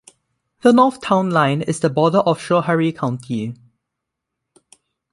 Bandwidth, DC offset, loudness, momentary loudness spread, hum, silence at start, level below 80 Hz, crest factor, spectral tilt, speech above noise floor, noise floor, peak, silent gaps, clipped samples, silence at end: 11.5 kHz; under 0.1%; -17 LUFS; 11 LU; none; 0.65 s; -60 dBFS; 18 dB; -6.5 dB/octave; 63 dB; -80 dBFS; -2 dBFS; none; under 0.1%; 1.6 s